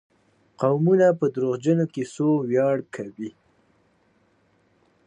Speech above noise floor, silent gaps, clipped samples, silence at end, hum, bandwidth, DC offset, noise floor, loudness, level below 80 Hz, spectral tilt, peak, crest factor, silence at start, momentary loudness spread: 42 dB; none; under 0.1%; 1.75 s; none; 9.8 kHz; under 0.1%; -64 dBFS; -22 LUFS; -72 dBFS; -8 dB/octave; -8 dBFS; 18 dB; 0.6 s; 17 LU